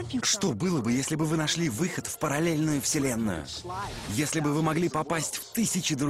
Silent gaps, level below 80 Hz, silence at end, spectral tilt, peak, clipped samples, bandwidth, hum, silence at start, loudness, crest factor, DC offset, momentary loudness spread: none; -54 dBFS; 0 s; -4 dB/octave; -12 dBFS; under 0.1%; 16 kHz; none; 0 s; -28 LUFS; 14 dB; under 0.1%; 6 LU